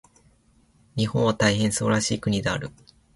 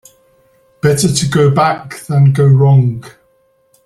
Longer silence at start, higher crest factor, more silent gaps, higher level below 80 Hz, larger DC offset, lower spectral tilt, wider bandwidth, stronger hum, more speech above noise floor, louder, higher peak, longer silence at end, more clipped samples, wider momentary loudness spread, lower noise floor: about the same, 0.95 s vs 0.85 s; first, 18 dB vs 12 dB; neither; about the same, -50 dBFS vs -46 dBFS; neither; second, -4.5 dB/octave vs -6 dB/octave; second, 11.5 kHz vs 13 kHz; neither; second, 37 dB vs 45 dB; second, -23 LUFS vs -12 LUFS; second, -8 dBFS vs 0 dBFS; second, 0.45 s vs 0.75 s; neither; about the same, 10 LU vs 9 LU; first, -60 dBFS vs -55 dBFS